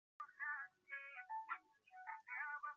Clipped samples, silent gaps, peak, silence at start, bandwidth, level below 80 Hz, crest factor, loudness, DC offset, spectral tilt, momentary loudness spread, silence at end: under 0.1%; none; -34 dBFS; 0.2 s; 7.4 kHz; under -90 dBFS; 18 dB; -50 LUFS; under 0.1%; 3 dB/octave; 10 LU; 0 s